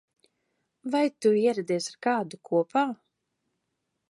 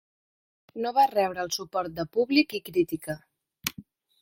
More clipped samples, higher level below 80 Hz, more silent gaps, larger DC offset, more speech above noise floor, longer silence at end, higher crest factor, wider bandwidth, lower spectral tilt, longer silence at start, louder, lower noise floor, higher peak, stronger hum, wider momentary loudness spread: neither; second, -84 dBFS vs -64 dBFS; neither; neither; first, 54 dB vs 24 dB; first, 1.15 s vs 0.4 s; second, 18 dB vs 24 dB; second, 11.5 kHz vs 16.5 kHz; about the same, -5 dB/octave vs -4 dB/octave; about the same, 0.85 s vs 0.75 s; about the same, -27 LUFS vs -27 LUFS; first, -80 dBFS vs -50 dBFS; second, -12 dBFS vs -4 dBFS; neither; second, 7 LU vs 11 LU